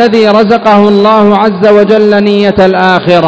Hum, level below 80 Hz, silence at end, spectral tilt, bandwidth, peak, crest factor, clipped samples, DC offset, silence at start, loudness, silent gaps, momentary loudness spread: none; -40 dBFS; 0 s; -7 dB/octave; 8 kHz; 0 dBFS; 6 dB; 10%; under 0.1%; 0 s; -6 LUFS; none; 2 LU